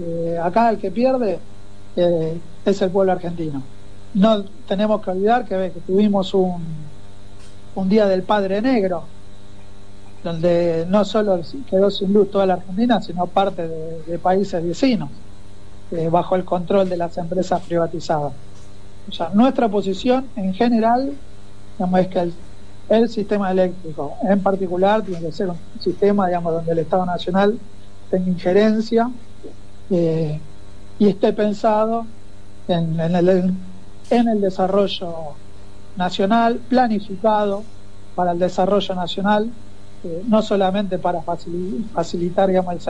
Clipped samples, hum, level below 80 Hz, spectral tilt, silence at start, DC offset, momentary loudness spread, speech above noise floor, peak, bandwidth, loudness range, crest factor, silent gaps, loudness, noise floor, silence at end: under 0.1%; none; -46 dBFS; -7.5 dB/octave; 0 s; 4%; 12 LU; 24 dB; -4 dBFS; 10 kHz; 2 LU; 16 dB; none; -20 LUFS; -42 dBFS; 0 s